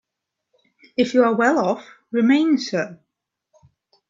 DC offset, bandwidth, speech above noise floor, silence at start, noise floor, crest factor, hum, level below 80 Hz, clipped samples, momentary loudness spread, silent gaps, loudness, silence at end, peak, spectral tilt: under 0.1%; 7.6 kHz; 63 dB; 1 s; -82 dBFS; 18 dB; none; -68 dBFS; under 0.1%; 12 LU; none; -20 LUFS; 1.15 s; -2 dBFS; -5.5 dB/octave